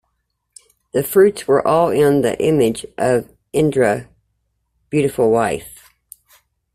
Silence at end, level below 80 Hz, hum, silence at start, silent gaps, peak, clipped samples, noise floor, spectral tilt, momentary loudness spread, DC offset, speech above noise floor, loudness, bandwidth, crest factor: 1.05 s; -50 dBFS; none; 0.95 s; none; -2 dBFS; under 0.1%; -71 dBFS; -6 dB/octave; 9 LU; under 0.1%; 56 dB; -17 LUFS; 16 kHz; 16 dB